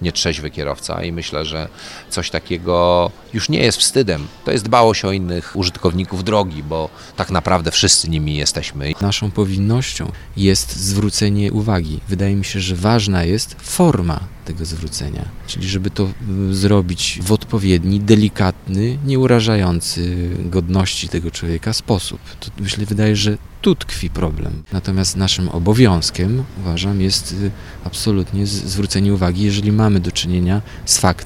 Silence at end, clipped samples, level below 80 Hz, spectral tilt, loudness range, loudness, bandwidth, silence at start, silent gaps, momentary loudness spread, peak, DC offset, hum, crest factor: 0 s; under 0.1%; -34 dBFS; -5 dB/octave; 4 LU; -17 LUFS; 15.5 kHz; 0 s; none; 11 LU; 0 dBFS; under 0.1%; none; 16 dB